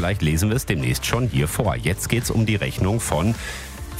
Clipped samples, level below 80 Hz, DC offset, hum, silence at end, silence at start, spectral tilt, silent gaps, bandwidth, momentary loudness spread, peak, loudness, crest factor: under 0.1%; -34 dBFS; under 0.1%; none; 0 s; 0 s; -5 dB/octave; none; 16 kHz; 3 LU; -4 dBFS; -22 LUFS; 18 dB